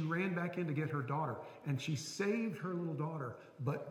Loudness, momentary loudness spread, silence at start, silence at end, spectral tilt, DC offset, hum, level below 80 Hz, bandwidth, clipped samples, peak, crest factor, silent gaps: -39 LUFS; 6 LU; 0 s; 0 s; -6 dB/octave; under 0.1%; none; -82 dBFS; 16 kHz; under 0.1%; -24 dBFS; 14 dB; none